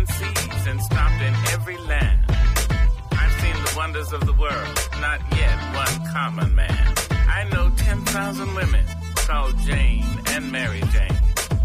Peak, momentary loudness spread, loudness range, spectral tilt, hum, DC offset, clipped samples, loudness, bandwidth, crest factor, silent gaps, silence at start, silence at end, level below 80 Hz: -8 dBFS; 4 LU; 1 LU; -4.5 dB/octave; none; under 0.1%; under 0.1%; -22 LUFS; 16 kHz; 12 dB; none; 0 s; 0 s; -22 dBFS